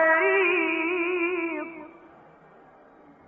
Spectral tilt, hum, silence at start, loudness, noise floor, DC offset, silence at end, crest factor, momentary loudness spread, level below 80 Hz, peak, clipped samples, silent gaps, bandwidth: -0.5 dB/octave; none; 0 s; -24 LUFS; -53 dBFS; under 0.1%; 1.3 s; 16 dB; 16 LU; -72 dBFS; -10 dBFS; under 0.1%; none; 3.5 kHz